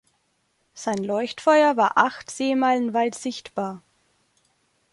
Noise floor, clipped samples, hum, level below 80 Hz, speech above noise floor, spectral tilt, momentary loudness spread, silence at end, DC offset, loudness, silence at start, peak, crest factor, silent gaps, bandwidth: -69 dBFS; under 0.1%; none; -70 dBFS; 48 dB; -4 dB/octave; 14 LU; 1.15 s; under 0.1%; -22 LUFS; 0.75 s; -2 dBFS; 22 dB; none; 11.5 kHz